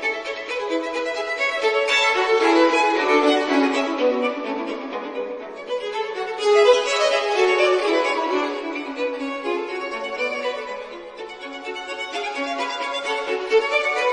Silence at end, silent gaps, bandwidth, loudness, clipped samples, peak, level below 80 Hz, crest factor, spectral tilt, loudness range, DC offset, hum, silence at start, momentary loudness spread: 0 s; none; 10.5 kHz; -21 LUFS; under 0.1%; -2 dBFS; -66 dBFS; 18 dB; -1.5 dB/octave; 9 LU; under 0.1%; none; 0 s; 13 LU